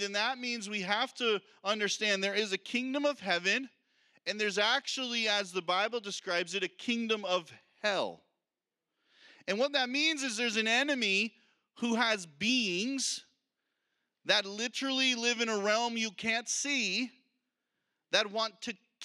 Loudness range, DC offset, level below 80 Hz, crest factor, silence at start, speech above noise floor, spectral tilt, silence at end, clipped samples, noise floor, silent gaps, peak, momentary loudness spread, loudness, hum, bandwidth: 3 LU; under 0.1%; -86 dBFS; 22 dB; 0 s; over 58 dB; -2 dB/octave; 0 s; under 0.1%; under -90 dBFS; none; -10 dBFS; 7 LU; -31 LUFS; none; 13.5 kHz